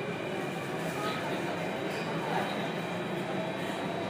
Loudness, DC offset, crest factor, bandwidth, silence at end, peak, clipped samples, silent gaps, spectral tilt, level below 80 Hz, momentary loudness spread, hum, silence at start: -34 LUFS; under 0.1%; 16 dB; 15.5 kHz; 0 s; -18 dBFS; under 0.1%; none; -5.5 dB/octave; -70 dBFS; 3 LU; none; 0 s